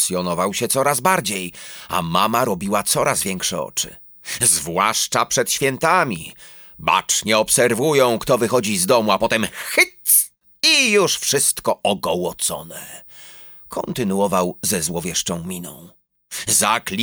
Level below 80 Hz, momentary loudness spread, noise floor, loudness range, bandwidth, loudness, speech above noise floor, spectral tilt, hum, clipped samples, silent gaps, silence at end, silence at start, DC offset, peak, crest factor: -52 dBFS; 15 LU; -41 dBFS; 7 LU; over 20 kHz; -18 LUFS; 22 dB; -2.5 dB/octave; none; under 0.1%; none; 0 s; 0 s; under 0.1%; -2 dBFS; 18 dB